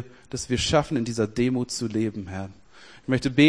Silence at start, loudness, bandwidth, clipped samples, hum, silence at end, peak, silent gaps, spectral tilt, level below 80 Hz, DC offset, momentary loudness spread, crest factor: 0 s; -26 LUFS; 10.5 kHz; under 0.1%; none; 0 s; -4 dBFS; none; -5 dB/octave; -46 dBFS; 0.2%; 14 LU; 20 dB